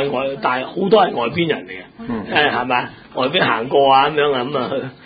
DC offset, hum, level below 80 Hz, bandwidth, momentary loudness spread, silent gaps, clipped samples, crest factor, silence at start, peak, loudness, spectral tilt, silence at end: under 0.1%; none; -52 dBFS; 5 kHz; 12 LU; none; under 0.1%; 16 dB; 0 s; 0 dBFS; -17 LUFS; -10 dB/octave; 0.1 s